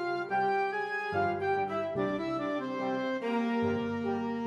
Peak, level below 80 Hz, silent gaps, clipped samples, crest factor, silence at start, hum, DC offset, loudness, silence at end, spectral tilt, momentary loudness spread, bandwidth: -16 dBFS; -62 dBFS; none; under 0.1%; 14 dB; 0 s; none; under 0.1%; -32 LUFS; 0 s; -7 dB/octave; 3 LU; 8.8 kHz